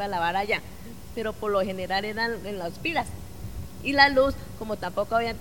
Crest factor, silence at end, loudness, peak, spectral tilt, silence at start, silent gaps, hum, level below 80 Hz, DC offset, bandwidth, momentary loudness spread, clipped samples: 24 dB; 0 s; -26 LUFS; -2 dBFS; -4.5 dB/octave; 0 s; none; none; -46 dBFS; 0.7%; 19 kHz; 20 LU; under 0.1%